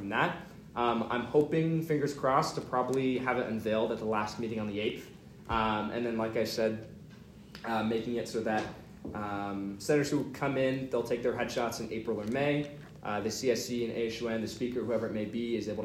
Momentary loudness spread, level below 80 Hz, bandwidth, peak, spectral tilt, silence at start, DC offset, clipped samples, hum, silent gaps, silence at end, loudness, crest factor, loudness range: 13 LU; -60 dBFS; 16 kHz; -14 dBFS; -5.5 dB/octave; 0 s; under 0.1%; under 0.1%; none; none; 0 s; -32 LUFS; 18 dB; 4 LU